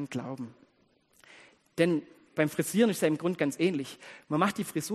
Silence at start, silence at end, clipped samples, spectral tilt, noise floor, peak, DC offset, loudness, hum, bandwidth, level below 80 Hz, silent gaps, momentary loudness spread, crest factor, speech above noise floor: 0 s; 0 s; under 0.1%; -5.5 dB/octave; -68 dBFS; -10 dBFS; under 0.1%; -29 LUFS; none; 13 kHz; -74 dBFS; none; 15 LU; 20 dB; 39 dB